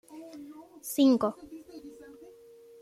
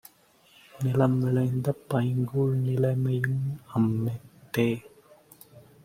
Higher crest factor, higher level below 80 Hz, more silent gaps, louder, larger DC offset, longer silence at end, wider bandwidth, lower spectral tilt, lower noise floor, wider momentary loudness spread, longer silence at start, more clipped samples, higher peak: about the same, 18 dB vs 18 dB; second, -72 dBFS vs -62 dBFS; neither; about the same, -26 LUFS vs -27 LUFS; neither; first, 0.9 s vs 0.25 s; about the same, 15.5 kHz vs 15.5 kHz; second, -4.5 dB/octave vs -8.5 dB/octave; second, -53 dBFS vs -60 dBFS; first, 25 LU vs 8 LU; second, 0.1 s vs 0.75 s; neither; second, -14 dBFS vs -8 dBFS